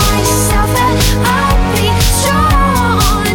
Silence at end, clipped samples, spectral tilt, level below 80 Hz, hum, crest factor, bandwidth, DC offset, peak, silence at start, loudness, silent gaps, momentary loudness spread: 0 s; under 0.1%; -4 dB/octave; -16 dBFS; none; 8 dB; 19 kHz; under 0.1%; -2 dBFS; 0 s; -11 LUFS; none; 1 LU